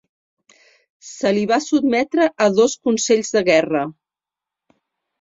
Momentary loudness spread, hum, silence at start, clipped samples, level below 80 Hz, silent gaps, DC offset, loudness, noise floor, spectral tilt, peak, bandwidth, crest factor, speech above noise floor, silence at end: 7 LU; none; 1.05 s; under 0.1%; -62 dBFS; none; under 0.1%; -18 LUFS; -88 dBFS; -4 dB/octave; -2 dBFS; 7.8 kHz; 18 dB; 70 dB; 1.3 s